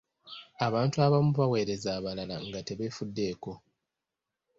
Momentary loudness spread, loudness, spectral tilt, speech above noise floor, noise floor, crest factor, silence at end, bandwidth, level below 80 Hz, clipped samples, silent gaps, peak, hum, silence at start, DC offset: 20 LU; -30 LUFS; -6.5 dB/octave; 58 dB; -88 dBFS; 18 dB; 1 s; 7.8 kHz; -60 dBFS; under 0.1%; none; -12 dBFS; none; 0.25 s; under 0.1%